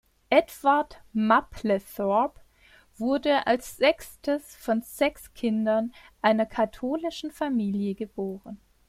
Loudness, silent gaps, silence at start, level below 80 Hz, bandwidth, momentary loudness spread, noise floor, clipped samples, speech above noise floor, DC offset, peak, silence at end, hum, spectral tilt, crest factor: -26 LUFS; none; 0.3 s; -56 dBFS; 16 kHz; 9 LU; -58 dBFS; under 0.1%; 32 dB; under 0.1%; -6 dBFS; 0.3 s; none; -5.5 dB/octave; 22 dB